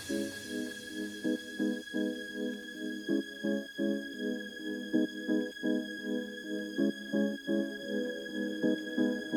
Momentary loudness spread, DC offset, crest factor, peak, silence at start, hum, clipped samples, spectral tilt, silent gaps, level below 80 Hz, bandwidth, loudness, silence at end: 6 LU; under 0.1%; 18 dB; -18 dBFS; 0 s; none; under 0.1%; -5 dB/octave; none; -74 dBFS; 19 kHz; -35 LUFS; 0 s